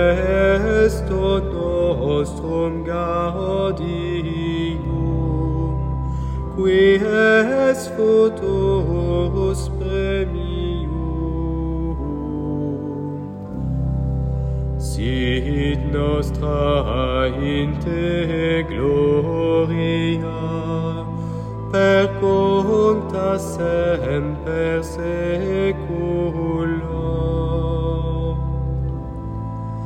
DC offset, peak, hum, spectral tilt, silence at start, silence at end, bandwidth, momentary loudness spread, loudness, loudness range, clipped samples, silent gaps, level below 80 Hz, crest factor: under 0.1%; -4 dBFS; none; -7 dB/octave; 0 s; 0 s; 14.5 kHz; 9 LU; -20 LUFS; 6 LU; under 0.1%; none; -28 dBFS; 16 dB